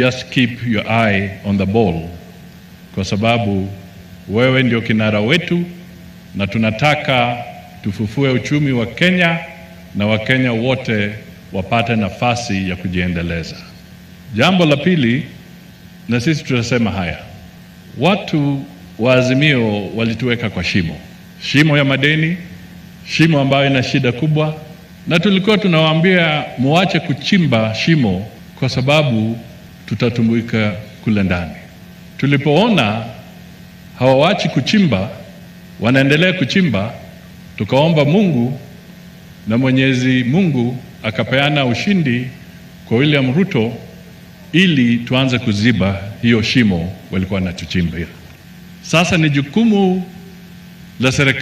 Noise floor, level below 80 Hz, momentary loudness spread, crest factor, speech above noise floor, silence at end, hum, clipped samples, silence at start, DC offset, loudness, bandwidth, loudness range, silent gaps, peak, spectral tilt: -38 dBFS; -44 dBFS; 16 LU; 16 dB; 24 dB; 0 s; none; under 0.1%; 0 s; under 0.1%; -15 LUFS; 15 kHz; 3 LU; none; 0 dBFS; -6 dB/octave